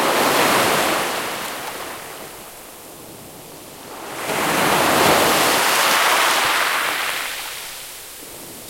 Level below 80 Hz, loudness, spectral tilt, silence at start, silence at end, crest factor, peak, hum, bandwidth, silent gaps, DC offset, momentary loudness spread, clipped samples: -54 dBFS; -17 LUFS; -1.5 dB/octave; 0 s; 0 s; 18 dB; -2 dBFS; none; 16.5 kHz; none; under 0.1%; 22 LU; under 0.1%